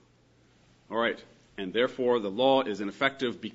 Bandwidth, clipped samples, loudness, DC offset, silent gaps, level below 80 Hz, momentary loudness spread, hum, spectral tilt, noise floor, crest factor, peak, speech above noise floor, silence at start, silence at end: 8 kHz; under 0.1%; -28 LUFS; under 0.1%; none; -70 dBFS; 13 LU; none; -5.5 dB/octave; -63 dBFS; 20 dB; -8 dBFS; 34 dB; 0.9 s; 0 s